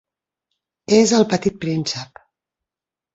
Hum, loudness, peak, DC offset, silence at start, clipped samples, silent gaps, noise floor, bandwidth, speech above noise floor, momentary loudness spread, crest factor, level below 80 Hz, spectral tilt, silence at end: none; -18 LUFS; -2 dBFS; under 0.1%; 0.9 s; under 0.1%; none; -89 dBFS; 8 kHz; 71 dB; 14 LU; 20 dB; -58 dBFS; -4.5 dB/octave; 1.1 s